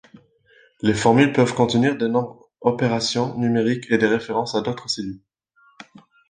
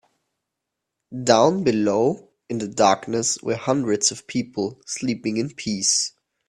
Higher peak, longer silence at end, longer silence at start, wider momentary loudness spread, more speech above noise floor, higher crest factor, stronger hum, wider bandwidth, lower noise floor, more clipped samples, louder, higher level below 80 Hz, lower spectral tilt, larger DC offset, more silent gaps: about the same, -2 dBFS vs 0 dBFS; first, 1.1 s vs 0.4 s; second, 0.85 s vs 1.1 s; about the same, 10 LU vs 11 LU; second, 39 dB vs 61 dB; about the same, 20 dB vs 22 dB; neither; second, 9.8 kHz vs 13 kHz; second, -59 dBFS vs -82 dBFS; neither; about the same, -20 LUFS vs -22 LUFS; first, -56 dBFS vs -62 dBFS; first, -5.5 dB/octave vs -3.5 dB/octave; neither; neither